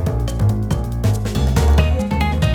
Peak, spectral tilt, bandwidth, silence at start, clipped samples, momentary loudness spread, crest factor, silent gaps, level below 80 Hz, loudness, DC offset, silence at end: -2 dBFS; -6.5 dB/octave; 16.5 kHz; 0 s; under 0.1%; 5 LU; 16 dB; none; -22 dBFS; -18 LUFS; under 0.1%; 0 s